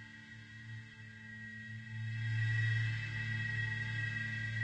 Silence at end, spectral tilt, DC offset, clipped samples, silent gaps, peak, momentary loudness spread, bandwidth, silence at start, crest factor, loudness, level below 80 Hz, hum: 0 s; -5.5 dB/octave; under 0.1%; under 0.1%; none; -26 dBFS; 17 LU; 8.4 kHz; 0 s; 14 dB; -38 LUFS; -64 dBFS; none